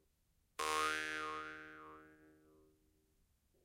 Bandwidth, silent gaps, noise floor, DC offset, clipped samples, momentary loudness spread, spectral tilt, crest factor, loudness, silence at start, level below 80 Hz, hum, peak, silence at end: 16.5 kHz; none; -78 dBFS; under 0.1%; under 0.1%; 20 LU; -1 dB/octave; 24 dB; -40 LUFS; 0.6 s; -74 dBFS; none; -22 dBFS; 1.3 s